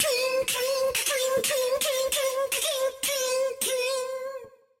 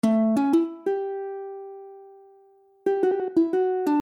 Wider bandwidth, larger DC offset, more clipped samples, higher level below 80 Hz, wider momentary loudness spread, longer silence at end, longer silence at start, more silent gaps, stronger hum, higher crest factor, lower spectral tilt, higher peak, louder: first, 16.5 kHz vs 13.5 kHz; neither; neither; first, -64 dBFS vs -74 dBFS; second, 5 LU vs 18 LU; first, 0.3 s vs 0 s; about the same, 0 s vs 0.05 s; neither; neither; about the same, 14 dB vs 16 dB; second, 0.5 dB/octave vs -7.5 dB/octave; about the same, -12 dBFS vs -10 dBFS; about the same, -26 LUFS vs -24 LUFS